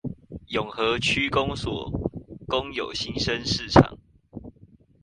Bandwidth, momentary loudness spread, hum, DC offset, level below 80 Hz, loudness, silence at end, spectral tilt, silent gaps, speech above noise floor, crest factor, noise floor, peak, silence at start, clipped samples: 11 kHz; 22 LU; none; under 0.1%; -42 dBFS; -25 LUFS; 0.55 s; -5 dB/octave; none; 30 dB; 26 dB; -54 dBFS; 0 dBFS; 0.05 s; under 0.1%